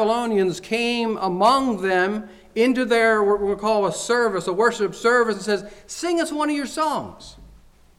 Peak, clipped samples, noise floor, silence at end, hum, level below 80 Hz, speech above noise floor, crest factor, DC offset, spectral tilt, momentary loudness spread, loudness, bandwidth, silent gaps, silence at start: -6 dBFS; under 0.1%; -50 dBFS; 0.5 s; none; -52 dBFS; 29 dB; 14 dB; under 0.1%; -4 dB/octave; 8 LU; -21 LUFS; 14.5 kHz; none; 0 s